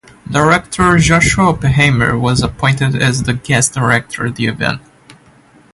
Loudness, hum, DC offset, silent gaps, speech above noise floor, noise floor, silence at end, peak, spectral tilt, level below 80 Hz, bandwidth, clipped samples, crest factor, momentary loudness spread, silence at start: -13 LUFS; none; under 0.1%; none; 33 dB; -46 dBFS; 0.65 s; 0 dBFS; -4.5 dB/octave; -32 dBFS; 11.5 kHz; under 0.1%; 14 dB; 8 LU; 0.3 s